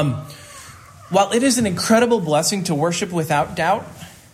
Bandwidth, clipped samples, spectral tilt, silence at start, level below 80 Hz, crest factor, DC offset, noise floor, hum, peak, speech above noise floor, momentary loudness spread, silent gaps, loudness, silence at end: 16 kHz; under 0.1%; -4.5 dB/octave; 0 s; -54 dBFS; 16 dB; under 0.1%; -41 dBFS; none; -2 dBFS; 23 dB; 21 LU; none; -18 LUFS; 0.2 s